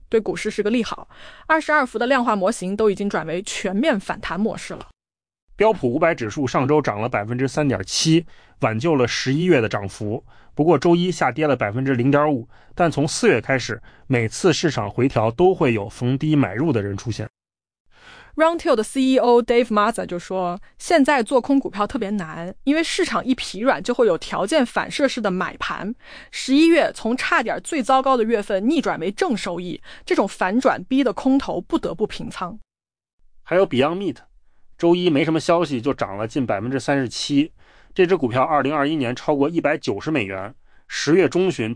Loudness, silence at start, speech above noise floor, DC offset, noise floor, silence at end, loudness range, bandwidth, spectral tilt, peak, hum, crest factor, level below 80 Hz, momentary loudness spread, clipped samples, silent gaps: -20 LUFS; 0.1 s; 28 dB; under 0.1%; -48 dBFS; 0 s; 3 LU; 10.5 kHz; -5.5 dB/octave; -6 dBFS; none; 16 dB; -48 dBFS; 11 LU; under 0.1%; 5.42-5.47 s, 17.30-17.34 s, 17.80-17.85 s, 33.13-33.18 s